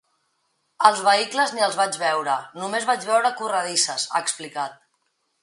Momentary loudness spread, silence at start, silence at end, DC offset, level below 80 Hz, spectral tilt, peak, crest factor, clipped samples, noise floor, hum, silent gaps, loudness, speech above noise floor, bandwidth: 9 LU; 0.8 s; 0.7 s; under 0.1%; -80 dBFS; -1 dB/octave; 0 dBFS; 22 dB; under 0.1%; -71 dBFS; none; none; -22 LUFS; 49 dB; 11.5 kHz